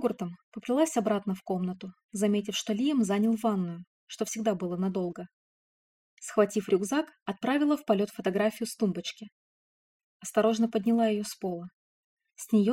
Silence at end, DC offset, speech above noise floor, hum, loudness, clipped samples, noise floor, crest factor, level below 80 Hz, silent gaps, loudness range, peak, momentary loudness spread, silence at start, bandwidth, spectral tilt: 0 s; under 0.1%; over 61 dB; none; -29 LUFS; under 0.1%; under -90 dBFS; 18 dB; -74 dBFS; 0.43-0.52 s, 2.04-2.09 s, 3.87-4.07 s, 5.33-6.17 s, 7.22-7.26 s, 9.32-10.20 s, 11.73-12.17 s; 3 LU; -10 dBFS; 15 LU; 0 s; 16.5 kHz; -5.5 dB/octave